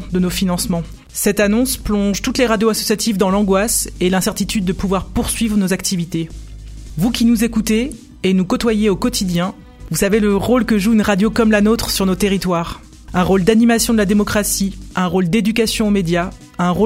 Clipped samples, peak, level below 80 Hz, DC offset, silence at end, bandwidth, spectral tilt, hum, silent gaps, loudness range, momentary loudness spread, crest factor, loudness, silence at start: under 0.1%; 0 dBFS; -32 dBFS; under 0.1%; 0 s; 16.5 kHz; -4.5 dB/octave; none; none; 3 LU; 8 LU; 16 dB; -16 LUFS; 0 s